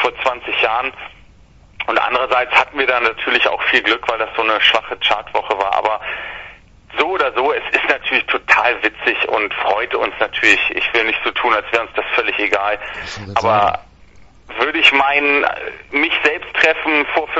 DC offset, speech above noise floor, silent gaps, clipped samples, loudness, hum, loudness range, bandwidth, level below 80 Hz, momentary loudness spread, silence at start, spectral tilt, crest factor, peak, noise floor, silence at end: under 0.1%; 29 dB; none; under 0.1%; -15 LUFS; none; 3 LU; 11 kHz; -48 dBFS; 9 LU; 0 s; -3 dB/octave; 18 dB; 0 dBFS; -46 dBFS; 0 s